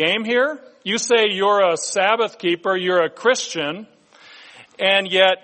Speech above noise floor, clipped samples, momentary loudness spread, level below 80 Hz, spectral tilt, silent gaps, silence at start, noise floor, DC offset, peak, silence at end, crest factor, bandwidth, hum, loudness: 28 dB; under 0.1%; 8 LU; -72 dBFS; -2.5 dB/octave; none; 0 s; -46 dBFS; under 0.1%; 0 dBFS; 0.05 s; 18 dB; 8.8 kHz; none; -18 LUFS